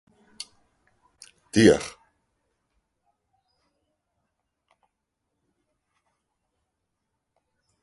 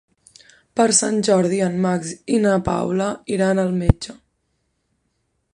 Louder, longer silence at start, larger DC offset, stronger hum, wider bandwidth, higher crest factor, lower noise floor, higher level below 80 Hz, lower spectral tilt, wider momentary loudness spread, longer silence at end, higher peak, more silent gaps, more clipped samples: about the same, -20 LUFS vs -19 LUFS; first, 1.55 s vs 0.75 s; neither; neither; about the same, 11.5 kHz vs 11 kHz; first, 28 dB vs 20 dB; first, -81 dBFS vs -70 dBFS; second, -58 dBFS vs -36 dBFS; about the same, -5 dB/octave vs -5 dB/octave; first, 23 LU vs 8 LU; first, 5.95 s vs 1.4 s; about the same, -4 dBFS vs -2 dBFS; neither; neither